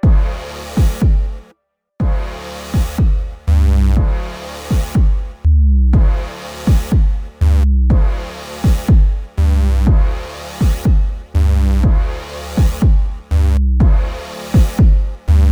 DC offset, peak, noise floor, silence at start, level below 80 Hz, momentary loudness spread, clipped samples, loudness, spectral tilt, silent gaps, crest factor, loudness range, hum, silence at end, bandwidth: under 0.1%; -2 dBFS; -55 dBFS; 0.05 s; -14 dBFS; 10 LU; under 0.1%; -16 LUFS; -7.5 dB/octave; none; 12 dB; 3 LU; none; 0 s; 16 kHz